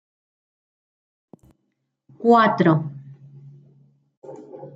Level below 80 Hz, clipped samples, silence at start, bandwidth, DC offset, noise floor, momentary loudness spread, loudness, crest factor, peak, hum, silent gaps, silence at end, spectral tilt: -70 dBFS; under 0.1%; 2.2 s; 7.8 kHz; under 0.1%; -75 dBFS; 26 LU; -18 LUFS; 20 dB; -4 dBFS; none; 4.17-4.22 s; 0.1 s; -8.5 dB/octave